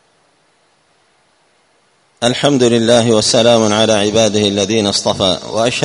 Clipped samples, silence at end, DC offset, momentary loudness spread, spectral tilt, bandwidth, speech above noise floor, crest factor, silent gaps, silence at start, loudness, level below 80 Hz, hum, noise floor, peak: under 0.1%; 0 s; under 0.1%; 5 LU; -4 dB/octave; 11 kHz; 44 dB; 14 dB; none; 2.2 s; -12 LUFS; -48 dBFS; none; -56 dBFS; 0 dBFS